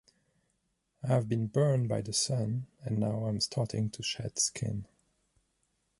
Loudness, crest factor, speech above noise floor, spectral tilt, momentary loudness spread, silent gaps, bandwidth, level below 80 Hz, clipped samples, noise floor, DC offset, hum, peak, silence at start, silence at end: -32 LUFS; 20 dB; 47 dB; -5 dB/octave; 9 LU; none; 11.5 kHz; -62 dBFS; under 0.1%; -78 dBFS; under 0.1%; none; -14 dBFS; 1.05 s; 1.15 s